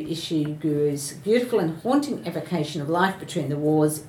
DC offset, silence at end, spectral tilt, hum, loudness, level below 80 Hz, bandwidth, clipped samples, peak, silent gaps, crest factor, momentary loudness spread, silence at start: under 0.1%; 0 s; -5.5 dB/octave; none; -24 LUFS; -62 dBFS; 18 kHz; under 0.1%; -6 dBFS; none; 18 dB; 7 LU; 0 s